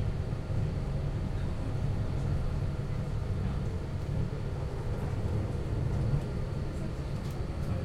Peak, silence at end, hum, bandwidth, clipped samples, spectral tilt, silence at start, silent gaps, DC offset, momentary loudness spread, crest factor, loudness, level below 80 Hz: -18 dBFS; 0 s; none; 12 kHz; under 0.1%; -8 dB/octave; 0 s; none; under 0.1%; 4 LU; 14 dB; -34 LUFS; -38 dBFS